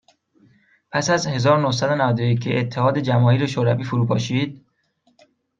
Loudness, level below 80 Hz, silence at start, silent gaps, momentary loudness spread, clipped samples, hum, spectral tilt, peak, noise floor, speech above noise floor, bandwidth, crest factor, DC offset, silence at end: -20 LUFS; -60 dBFS; 0.95 s; none; 6 LU; under 0.1%; none; -6 dB/octave; -4 dBFS; -64 dBFS; 45 dB; 7.6 kHz; 16 dB; under 0.1%; 1 s